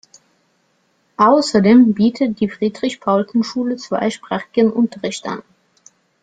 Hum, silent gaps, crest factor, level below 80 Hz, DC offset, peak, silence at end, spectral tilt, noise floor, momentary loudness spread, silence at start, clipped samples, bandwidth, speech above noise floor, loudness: none; none; 16 dB; -58 dBFS; under 0.1%; -2 dBFS; 0.85 s; -6 dB/octave; -62 dBFS; 14 LU; 1.2 s; under 0.1%; 9.2 kHz; 47 dB; -16 LUFS